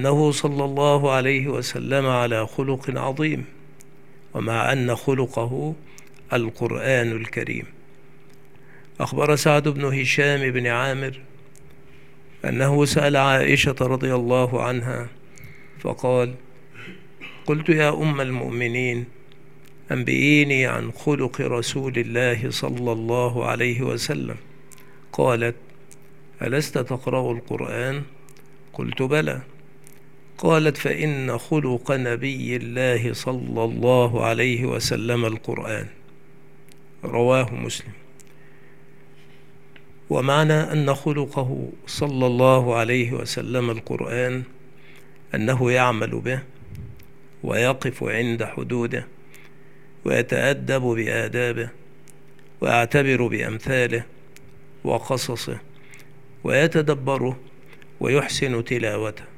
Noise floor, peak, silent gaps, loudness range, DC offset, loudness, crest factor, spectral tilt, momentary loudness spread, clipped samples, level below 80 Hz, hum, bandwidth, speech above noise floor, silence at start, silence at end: -51 dBFS; 0 dBFS; none; 5 LU; 0.9%; -22 LUFS; 22 dB; -5.5 dB/octave; 13 LU; under 0.1%; -58 dBFS; none; 16 kHz; 29 dB; 0 s; 0.1 s